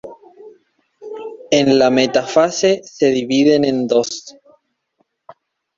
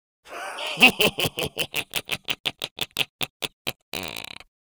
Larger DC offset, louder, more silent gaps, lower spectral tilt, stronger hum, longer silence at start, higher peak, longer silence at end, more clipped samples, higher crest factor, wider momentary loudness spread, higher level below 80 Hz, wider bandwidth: neither; first, -15 LUFS vs -24 LUFS; second, none vs 2.40-2.44 s, 2.71-2.76 s, 3.09-3.19 s, 3.30-3.40 s, 3.53-3.65 s, 3.82-3.92 s; first, -4.5 dB/octave vs -2 dB/octave; neither; second, 0.05 s vs 0.25 s; about the same, -2 dBFS vs 0 dBFS; first, 1.45 s vs 0.4 s; neither; second, 16 dB vs 26 dB; about the same, 18 LU vs 18 LU; about the same, -58 dBFS vs -56 dBFS; second, 7.6 kHz vs over 20 kHz